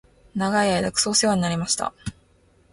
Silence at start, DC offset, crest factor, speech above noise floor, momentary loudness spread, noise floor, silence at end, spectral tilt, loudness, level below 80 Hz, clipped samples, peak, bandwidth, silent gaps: 0.35 s; under 0.1%; 18 dB; 36 dB; 15 LU; -58 dBFS; 0.6 s; -3.5 dB/octave; -22 LUFS; -50 dBFS; under 0.1%; -6 dBFS; 11.5 kHz; none